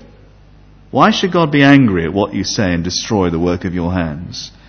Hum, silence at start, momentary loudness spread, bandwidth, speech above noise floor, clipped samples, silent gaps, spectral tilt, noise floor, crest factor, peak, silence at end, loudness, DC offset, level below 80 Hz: 50 Hz at -40 dBFS; 0.95 s; 12 LU; 6.6 kHz; 29 dB; under 0.1%; none; -5.5 dB/octave; -43 dBFS; 14 dB; 0 dBFS; 0.2 s; -14 LUFS; under 0.1%; -34 dBFS